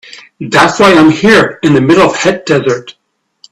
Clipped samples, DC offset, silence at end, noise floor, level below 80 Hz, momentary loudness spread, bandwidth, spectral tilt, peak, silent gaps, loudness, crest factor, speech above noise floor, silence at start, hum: 0.3%; under 0.1%; 0.6 s; -44 dBFS; -42 dBFS; 8 LU; 13 kHz; -5 dB/octave; 0 dBFS; none; -8 LUFS; 10 dB; 37 dB; 0.15 s; none